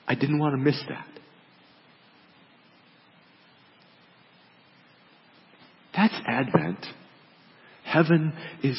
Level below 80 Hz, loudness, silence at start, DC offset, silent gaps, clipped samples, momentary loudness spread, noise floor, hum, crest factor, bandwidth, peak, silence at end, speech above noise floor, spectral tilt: -70 dBFS; -25 LUFS; 0.05 s; under 0.1%; none; under 0.1%; 19 LU; -57 dBFS; none; 28 dB; 5.8 kHz; -2 dBFS; 0 s; 33 dB; -11 dB/octave